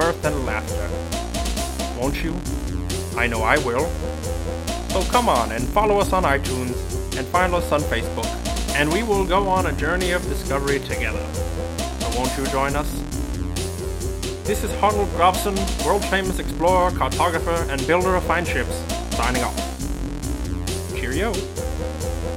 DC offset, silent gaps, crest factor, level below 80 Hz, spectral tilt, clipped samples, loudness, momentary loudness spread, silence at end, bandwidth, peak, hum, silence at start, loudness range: under 0.1%; none; 20 dB; -30 dBFS; -4.5 dB/octave; under 0.1%; -22 LUFS; 9 LU; 0 s; 17 kHz; 0 dBFS; none; 0 s; 4 LU